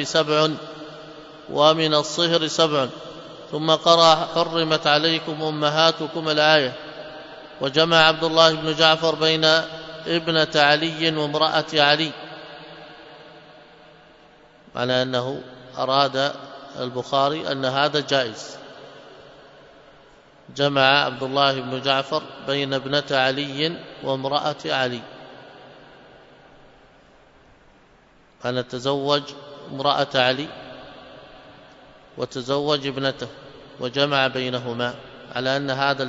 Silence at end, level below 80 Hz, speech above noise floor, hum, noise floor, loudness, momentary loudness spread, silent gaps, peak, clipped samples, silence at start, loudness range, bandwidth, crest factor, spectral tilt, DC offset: 0 s; -62 dBFS; 33 dB; none; -54 dBFS; -20 LUFS; 21 LU; none; 0 dBFS; under 0.1%; 0 s; 10 LU; 8 kHz; 22 dB; -4 dB/octave; under 0.1%